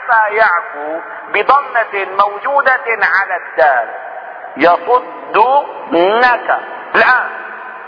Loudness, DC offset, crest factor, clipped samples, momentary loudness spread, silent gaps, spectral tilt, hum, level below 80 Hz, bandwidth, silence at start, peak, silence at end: -13 LUFS; under 0.1%; 14 dB; under 0.1%; 13 LU; none; -5 dB/octave; none; -58 dBFS; 5.4 kHz; 0 s; 0 dBFS; 0 s